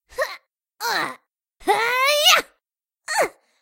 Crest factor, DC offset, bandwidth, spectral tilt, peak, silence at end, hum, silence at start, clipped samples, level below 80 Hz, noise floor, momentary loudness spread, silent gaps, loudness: 22 dB; under 0.1%; 16 kHz; 0.5 dB/octave; -2 dBFS; 0.3 s; none; 0.15 s; under 0.1%; -60 dBFS; -79 dBFS; 15 LU; none; -20 LUFS